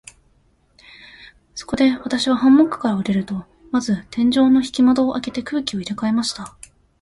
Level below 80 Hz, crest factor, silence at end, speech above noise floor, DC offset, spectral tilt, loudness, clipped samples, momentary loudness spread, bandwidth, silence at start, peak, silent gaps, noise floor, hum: -52 dBFS; 16 dB; 0.55 s; 41 dB; under 0.1%; -5 dB/octave; -19 LUFS; under 0.1%; 15 LU; 11.5 kHz; 1.2 s; -4 dBFS; none; -59 dBFS; none